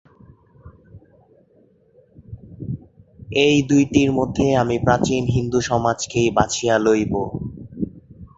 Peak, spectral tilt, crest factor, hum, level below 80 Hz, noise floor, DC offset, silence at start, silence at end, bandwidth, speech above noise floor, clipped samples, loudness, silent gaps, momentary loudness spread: -2 dBFS; -5.5 dB/octave; 20 dB; none; -44 dBFS; -56 dBFS; under 0.1%; 0.65 s; 0.1 s; 8 kHz; 38 dB; under 0.1%; -19 LUFS; none; 16 LU